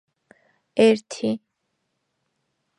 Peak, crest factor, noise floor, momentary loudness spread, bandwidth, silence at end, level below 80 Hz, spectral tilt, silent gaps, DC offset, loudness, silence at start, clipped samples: -4 dBFS; 22 dB; -76 dBFS; 12 LU; 10.5 kHz; 1.4 s; -74 dBFS; -5 dB/octave; none; under 0.1%; -22 LUFS; 0.75 s; under 0.1%